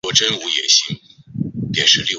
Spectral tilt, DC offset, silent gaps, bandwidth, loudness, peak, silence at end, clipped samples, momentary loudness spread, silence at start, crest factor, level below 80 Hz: -1.5 dB/octave; under 0.1%; none; 8.2 kHz; -15 LUFS; 0 dBFS; 0 s; under 0.1%; 16 LU; 0.05 s; 18 dB; -52 dBFS